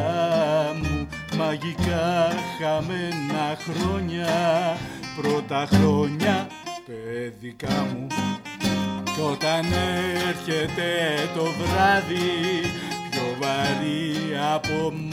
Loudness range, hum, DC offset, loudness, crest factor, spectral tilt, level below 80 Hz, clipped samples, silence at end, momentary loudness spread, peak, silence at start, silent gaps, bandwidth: 3 LU; none; under 0.1%; -24 LUFS; 20 dB; -5 dB/octave; -46 dBFS; under 0.1%; 0 s; 8 LU; -4 dBFS; 0 s; none; 16.5 kHz